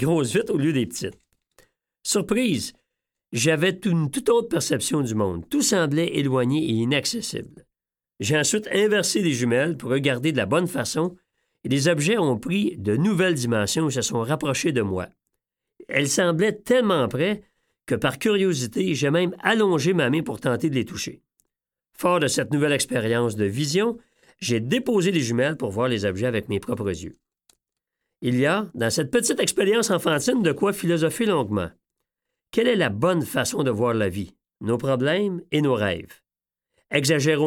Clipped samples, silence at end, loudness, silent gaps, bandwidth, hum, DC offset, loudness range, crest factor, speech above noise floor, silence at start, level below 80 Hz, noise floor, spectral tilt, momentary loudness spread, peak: under 0.1%; 0 s; -23 LUFS; none; 18 kHz; none; under 0.1%; 3 LU; 20 dB; 67 dB; 0 s; -58 dBFS; -89 dBFS; -4.5 dB/octave; 8 LU; -2 dBFS